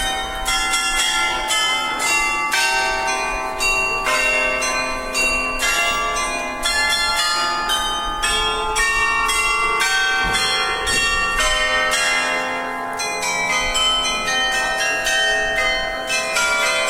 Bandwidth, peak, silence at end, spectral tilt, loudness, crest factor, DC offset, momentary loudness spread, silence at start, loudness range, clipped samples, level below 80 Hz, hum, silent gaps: 17 kHz; -4 dBFS; 0 s; 0 dB/octave; -18 LUFS; 14 dB; under 0.1%; 5 LU; 0 s; 1 LU; under 0.1%; -36 dBFS; none; none